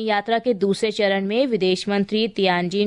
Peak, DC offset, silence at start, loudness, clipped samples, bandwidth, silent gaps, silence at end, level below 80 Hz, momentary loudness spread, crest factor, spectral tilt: -8 dBFS; under 0.1%; 0 s; -21 LUFS; under 0.1%; 11 kHz; none; 0 s; -62 dBFS; 2 LU; 14 dB; -5.5 dB/octave